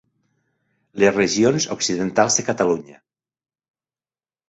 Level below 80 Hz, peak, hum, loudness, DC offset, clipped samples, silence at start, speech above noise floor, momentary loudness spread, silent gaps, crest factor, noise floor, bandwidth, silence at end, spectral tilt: -58 dBFS; -2 dBFS; none; -19 LUFS; under 0.1%; under 0.1%; 0.95 s; over 71 dB; 5 LU; none; 20 dB; under -90 dBFS; 8.2 kHz; 1.55 s; -3.5 dB/octave